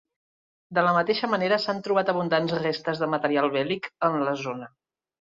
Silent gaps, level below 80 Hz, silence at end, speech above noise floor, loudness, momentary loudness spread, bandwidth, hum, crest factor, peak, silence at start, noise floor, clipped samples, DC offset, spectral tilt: none; -68 dBFS; 0.55 s; over 65 dB; -25 LUFS; 6 LU; 7.6 kHz; none; 18 dB; -8 dBFS; 0.7 s; under -90 dBFS; under 0.1%; under 0.1%; -6 dB/octave